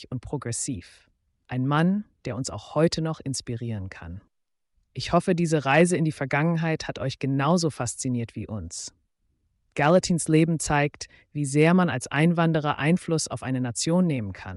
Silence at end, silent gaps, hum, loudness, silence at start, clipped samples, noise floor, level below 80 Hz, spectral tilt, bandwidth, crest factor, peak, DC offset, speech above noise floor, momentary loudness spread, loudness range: 0 s; none; none; -25 LUFS; 0 s; under 0.1%; -74 dBFS; -54 dBFS; -5.5 dB/octave; 11.5 kHz; 16 dB; -8 dBFS; under 0.1%; 50 dB; 14 LU; 5 LU